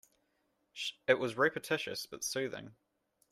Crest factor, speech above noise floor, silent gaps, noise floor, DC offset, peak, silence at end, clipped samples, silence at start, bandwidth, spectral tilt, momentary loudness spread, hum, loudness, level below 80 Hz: 24 dB; 43 dB; none; -79 dBFS; under 0.1%; -12 dBFS; 0.6 s; under 0.1%; 0.75 s; 15.5 kHz; -3 dB/octave; 10 LU; none; -34 LUFS; -76 dBFS